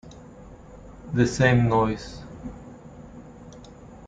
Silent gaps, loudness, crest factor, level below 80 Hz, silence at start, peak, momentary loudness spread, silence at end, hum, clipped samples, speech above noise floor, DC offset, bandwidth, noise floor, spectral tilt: none; -22 LUFS; 20 dB; -46 dBFS; 0.05 s; -6 dBFS; 27 LU; 0 s; none; under 0.1%; 24 dB; under 0.1%; 9.2 kHz; -45 dBFS; -6.5 dB/octave